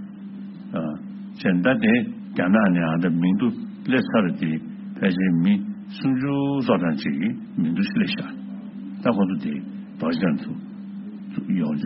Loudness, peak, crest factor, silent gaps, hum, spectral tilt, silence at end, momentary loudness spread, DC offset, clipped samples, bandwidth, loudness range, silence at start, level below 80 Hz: -23 LUFS; -6 dBFS; 18 dB; none; none; -6 dB/octave; 0 s; 16 LU; under 0.1%; under 0.1%; 5.8 kHz; 5 LU; 0 s; -62 dBFS